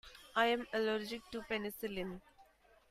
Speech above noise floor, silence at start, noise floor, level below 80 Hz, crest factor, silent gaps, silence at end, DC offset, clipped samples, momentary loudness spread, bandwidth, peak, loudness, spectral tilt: 29 dB; 0.05 s; -66 dBFS; -66 dBFS; 22 dB; none; 0.5 s; under 0.1%; under 0.1%; 12 LU; 15.5 kHz; -18 dBFS; -38 LUFS; -4.5 dB/octave